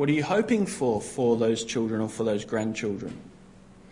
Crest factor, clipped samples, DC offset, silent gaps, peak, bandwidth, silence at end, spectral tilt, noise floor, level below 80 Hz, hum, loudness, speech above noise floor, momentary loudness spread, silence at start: 16 dB; under 0.1%; under 0.1%; none; -10 dBFS; 11 kHz; 0.5 s; -5.5 dB/octave; -51 dBFS; -60 dBFS; none; -27 LUFS; 25 dB; 8 LU; 0 s